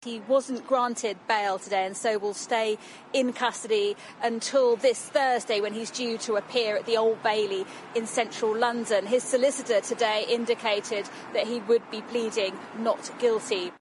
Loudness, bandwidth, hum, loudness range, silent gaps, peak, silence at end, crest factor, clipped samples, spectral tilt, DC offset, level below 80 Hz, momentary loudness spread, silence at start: -27 LUFS; 11.5 kHz; none; 2 LU; none; -10 dBFS; 0.05 s; 16 dB; under 0.1%; -2.5 dB/octave; under 0.1%; -80 dBFS; 6 LU; 0 s